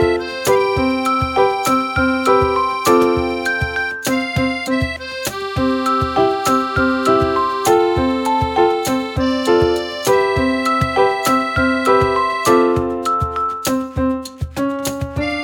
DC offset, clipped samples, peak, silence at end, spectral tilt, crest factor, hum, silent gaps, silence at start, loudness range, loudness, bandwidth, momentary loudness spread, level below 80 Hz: under 0.1%; under 0.1%; 0 dBFS; 0 s; -5 dB/octave; 16 dB; none; none; 0 s; 3 LU; -17 LUFS; 19.5 kHz; 7 LU; -36 dBFS